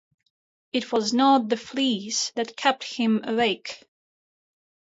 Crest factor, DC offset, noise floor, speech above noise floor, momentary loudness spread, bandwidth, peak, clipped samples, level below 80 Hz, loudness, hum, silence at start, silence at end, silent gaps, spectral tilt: 18 dB; under 0.1%; under -90 dBFS; over 66 dB; 10 LU; 8 kHz; -8 dBFS; under 0.1%; -70 dBFS; -24 LUFS; none; 0.75 s; 1.05 s; none; -3 dB/octave